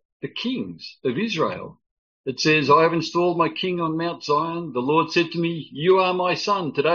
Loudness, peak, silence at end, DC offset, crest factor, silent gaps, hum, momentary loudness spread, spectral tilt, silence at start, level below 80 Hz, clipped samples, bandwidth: -22 LUFS; -4 dBFS; 0 s; under 0.1%; 18 dB; 1.91-2.24 s; none; 12 LU; -3.5 dB/octave; 0.25 s; -66 dBFS; under 0.1%; 7.2 kHz